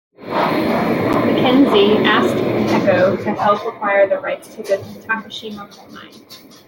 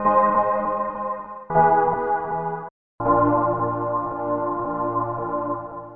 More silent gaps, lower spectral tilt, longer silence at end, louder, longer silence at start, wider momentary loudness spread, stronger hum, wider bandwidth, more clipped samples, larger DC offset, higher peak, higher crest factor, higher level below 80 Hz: second, none vs 2.71-2.98 s; second, -6 dB/octave vs -12 dB/octave; first, 0.3 s vs 0 s; first, -16 LUFS vs -22 LUFS; first, 0.2 s vs 0 s; first, 14 LU vs 11 LU; neither; first, 17 kHz vs 3.3 kHz; neither; second, under 0.1% vs 0.3%; first, -2 dBFS vs -6 dBFS; about the same, 16 dB vs 16 dB; about the same, -54 dBFS vs -52 dBFS